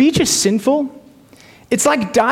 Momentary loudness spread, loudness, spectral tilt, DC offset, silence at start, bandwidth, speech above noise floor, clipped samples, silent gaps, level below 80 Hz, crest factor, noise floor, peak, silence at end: 7 LU; -15 LUFS; -3.5 dB/octave; under 0.1%; 0 s; 17 kHz; 30 dB; under 0.1%; none; -48 dBFS; 14 dB; -45 dBFS; -4 dBFS; 0 s